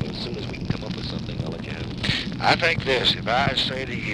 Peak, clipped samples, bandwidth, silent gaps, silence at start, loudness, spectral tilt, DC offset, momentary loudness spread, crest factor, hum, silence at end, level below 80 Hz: -4 dBFS; under 0.1%; 12.5 kHz; none; 0 s; -24 LUFS; -5 dB/octave; under 0.1%; 11 LU; 20 dB; none; 0 s; -42 dBFS